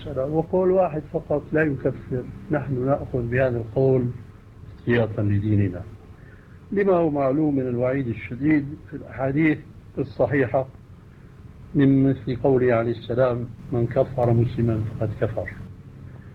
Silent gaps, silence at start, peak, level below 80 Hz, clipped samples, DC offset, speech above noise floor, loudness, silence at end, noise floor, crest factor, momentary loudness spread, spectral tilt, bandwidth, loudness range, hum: none; 0 s; -6 dBFS; -46 dBFS; under 0.1%; under 0.1%; 23 dB; -23 LUFS; 0 s; -45 dBFS; 16 dB; 12 LU; -10 dB/octave; 5.2 kHz; 3 LU; none